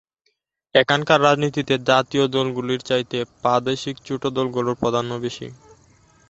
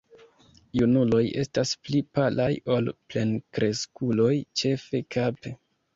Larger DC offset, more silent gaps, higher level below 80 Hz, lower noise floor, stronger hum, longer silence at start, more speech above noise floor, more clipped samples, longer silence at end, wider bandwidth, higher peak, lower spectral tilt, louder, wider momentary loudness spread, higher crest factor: neither; neither; about the same, -58 dBFS vs -56 dBFS; first, -71 dBFS vs -57 dBFS; neither; about the same, 0.75 s vs 0.75 s; first, 50 dB vs 32 dB; neither; first, 0.75 s vs 0.4 s; about the same, 8.2 kHz vs 7.8 kHz; first, -2 dBFS vs -10 dBFS; about the same, -5 dB/octave vs -6 dB/octave; first, -21 LUFS vs -26 LUFS; first, 11 LU vs 7 LU; about the same, 20 dB vs 16 dB